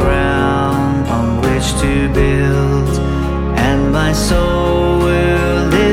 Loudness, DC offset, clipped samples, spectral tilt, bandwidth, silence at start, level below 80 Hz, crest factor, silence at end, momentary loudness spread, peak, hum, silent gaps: -14 LUFS; under 0.1%; under 0.1%; -6 dB/octave; 16 kHz; 0 s; -20 dBFS; 12 dB; 0 s; 3 LU; 0 dBFS; none; none